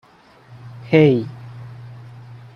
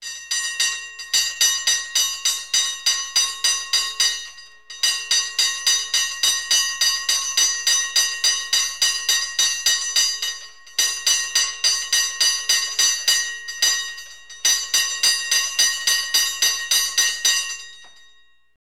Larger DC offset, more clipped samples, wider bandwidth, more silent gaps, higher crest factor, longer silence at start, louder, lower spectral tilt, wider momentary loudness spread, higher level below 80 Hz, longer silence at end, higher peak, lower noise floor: second, under 0.1% vs 0.4%; neither; second, 6.6 kHz vs 19 kHz; neither; first, 20 dB vs 14 dB; first, 0.65 s vs 0 s; about the same, -16 LUFS vs -18 LUFS; first, -9 dB/octave vs 4.5 dB/octave; first, 26 LU vs 6 LU; about the same, -58 dBFS vs -58 dBFS; second, 0.2 s vs 0.75 s; first, -2 dBFS vs -6 dBFS; second, -48 dBFS vs -56 dBFS